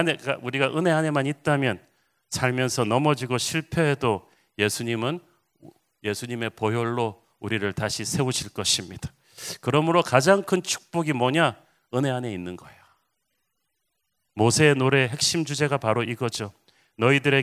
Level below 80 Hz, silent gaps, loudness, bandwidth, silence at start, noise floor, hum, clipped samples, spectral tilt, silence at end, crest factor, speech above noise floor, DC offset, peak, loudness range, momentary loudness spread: -56 dBFS; none; -24 LUFS; 16 kHz; 0 s; -78 dBFS; none; under 0.1%; -4.5 dB/octave; 0 s; 24 dB; 54 dB; under 0.1%; 0 dBFS; 5 LU; 14 LU